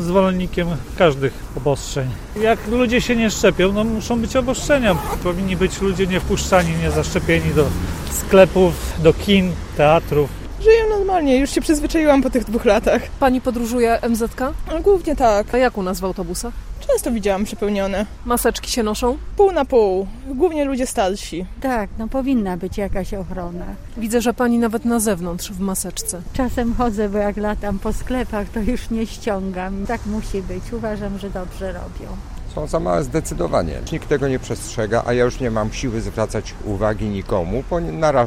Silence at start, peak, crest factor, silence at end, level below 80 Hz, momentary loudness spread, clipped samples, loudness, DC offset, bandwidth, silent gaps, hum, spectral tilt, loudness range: 0 s; 0 dBFS; 18 dB; 0 s; -30 dBFS; 11 LU; under 0.1%; -19 LUFS; under 0.1%; 16 kHz; none; none; -5.5 dB/octave; 8 LU